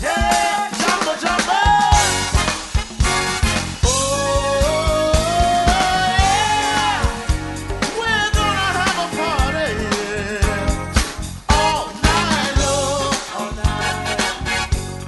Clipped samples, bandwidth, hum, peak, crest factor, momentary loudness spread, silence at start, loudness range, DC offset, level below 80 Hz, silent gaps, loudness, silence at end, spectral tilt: under 0.1%; 12 kHz; none; 0 dBFS; 18 dB; 7 LU; 0 s; 3 LU; under 0.1%; -26 dBFS; none; -18 LUFS; 0 s; -3.5 dB/octave